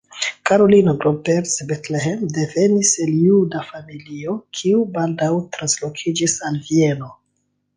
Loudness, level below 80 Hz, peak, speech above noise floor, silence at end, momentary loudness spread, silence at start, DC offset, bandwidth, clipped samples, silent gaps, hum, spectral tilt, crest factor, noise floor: -18 LUFS; -58 dBFS; -2 dBFS; 52 dB; 0.65 s; 13 LU; 0.15 s; under 0.1%; 10 kHz; under 0.1%; none; none; -4.5 dB/octave; 16 dB; -69 dBFS